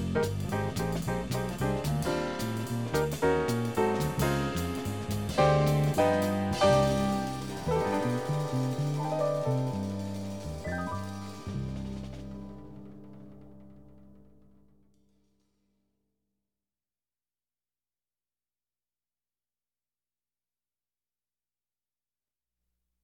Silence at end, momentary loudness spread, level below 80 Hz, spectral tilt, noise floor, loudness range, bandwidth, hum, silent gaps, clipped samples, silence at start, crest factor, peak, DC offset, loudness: 8.9 s; 15 LU; -50 dBFS; -6 dB/octave; under -90 dBFS; 15 LU; 19 kHz; 60 Hz at -60 dBFS; none; under 0.1%; 0 s; 20 dB; -12 dBFS; under 0.1%; -30 LUFS